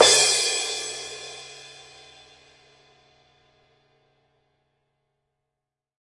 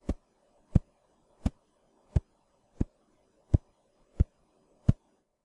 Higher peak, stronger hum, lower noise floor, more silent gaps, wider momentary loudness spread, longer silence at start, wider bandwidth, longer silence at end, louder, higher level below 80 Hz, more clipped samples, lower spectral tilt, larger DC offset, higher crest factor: first, 0 dBFS vs -6 dBFS; neither; first, -86 dBFS vs -70 dBFS; neither; first, 28 LU vs 7 LU; about the same, 0 s vs 0.1 s; about the same, 11.5 kHz vs 10.5 kHz; first, 4.3 s vs 0.5 s; first, -21 LUFS vs -33 LUFS; second, -68 dBFS vs -38 dBFS; neither; second, 1 dB/octave vs -9.5 dB/octave; neither; about the same, 28 dB vs 26 dB